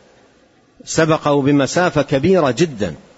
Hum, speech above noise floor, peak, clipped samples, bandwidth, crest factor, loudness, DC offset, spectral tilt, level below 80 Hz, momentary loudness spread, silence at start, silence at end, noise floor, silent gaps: none; 37 dB; -2 dBFS; under 0.1%; 8 kHz; 16 dB; -16 LUFS; under 0.1%; -5.5 dB/octave; -48 dBFS; 5 LU; 0.85 s; 0.2 s; -53 dBFS; none